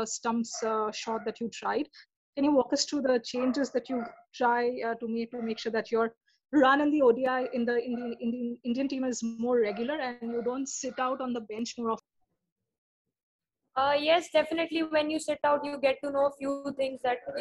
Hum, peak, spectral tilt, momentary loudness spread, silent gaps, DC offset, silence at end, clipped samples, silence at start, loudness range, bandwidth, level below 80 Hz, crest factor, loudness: none; -12 dBFS; -3.5 dB/octave; 9 LU; 2.16-2.33 s, 6.17-6.21 s, 12.52-12.56 s, 12.78-13.05 s, 13.23-13.39 s; under 0.1%; 0 s; under 0.1%; 0 s; 6 LU; 12 kHz; -70 dBFS; 18 dB; -29 LUFS